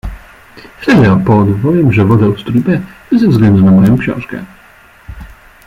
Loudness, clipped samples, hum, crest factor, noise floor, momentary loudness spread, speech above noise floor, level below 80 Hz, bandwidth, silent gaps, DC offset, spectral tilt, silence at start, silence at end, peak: -10 LUFS; under 0.1%; none; 10 dB; -41 dBFS; 13 LU; 32 dB; -34 dBFS; 7.2 kHz; none; under 0.1%; -9 dB/octave; 0.05 s; 0.35 s; 0 dBFS